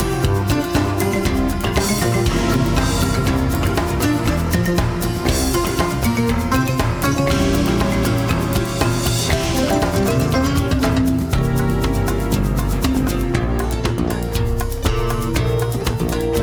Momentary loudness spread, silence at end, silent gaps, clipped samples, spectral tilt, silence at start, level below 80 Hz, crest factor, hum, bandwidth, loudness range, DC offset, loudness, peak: 3 LU; 0 s; none; under 0.1%; -5.5 dB/octave; 0 s; -26 dBFS; 16 dB; none; over 20 kHz; 2 LU; under 0.1%; -19 LUFS; -2 dBFS